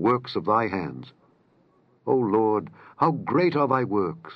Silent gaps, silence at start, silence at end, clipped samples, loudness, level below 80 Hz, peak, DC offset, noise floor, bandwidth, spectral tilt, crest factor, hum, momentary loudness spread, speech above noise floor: none; 0 s; 0 s; under 0.1%; -24 LUFS; -68 dBFS; -6 dBFS; under 0.1%; -62 dBFS; 6 kHz; -9 dB/octave; 18 dB; none; 13 LU; 38 dB